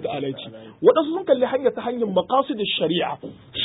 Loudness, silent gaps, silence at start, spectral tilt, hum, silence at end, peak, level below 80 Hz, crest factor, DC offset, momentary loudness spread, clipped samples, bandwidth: -22 LUFS; none; 0 s; -10 dB/octave; none; 0 s; -4 dBFS; -62 dBFS; 18 dB; under 0.1%; 14 LU; under 0.1%; 4 kHz